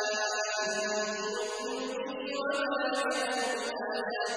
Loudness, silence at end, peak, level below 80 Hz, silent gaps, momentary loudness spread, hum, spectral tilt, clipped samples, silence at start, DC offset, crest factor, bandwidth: -32 LUFS; 0 s; -18 dBFS; -74 dBFS; none; 5 LU; none; -1 dB/octave; under 0.1%; 0 s; under 0.1%; 14 dB; 11 kHz